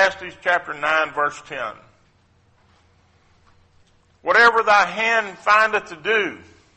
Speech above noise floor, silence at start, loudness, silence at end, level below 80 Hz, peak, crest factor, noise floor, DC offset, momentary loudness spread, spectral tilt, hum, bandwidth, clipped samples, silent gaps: 39 dB; 0 s; -19 LUFS; 0.4 s; -60 dBFS; -4 dBFS; 18 dB; -59 dBFS; under 0.1%; 16 LU; -2.5 dB/octave; none; 8.4 kHz; under 0.1%; none